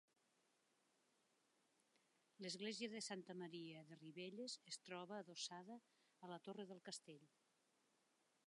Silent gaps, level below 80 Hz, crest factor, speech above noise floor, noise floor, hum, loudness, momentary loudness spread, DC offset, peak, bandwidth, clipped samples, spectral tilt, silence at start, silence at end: none; under -90 dBFS; 20 dB; 30 dB; -84 dBFS; none; -54 LUFS; 11 LU; under 0.1%; -36 dBFS; 11 kHz; under 0.1%; -3 dB/octave; 2.4 s; 1.2 s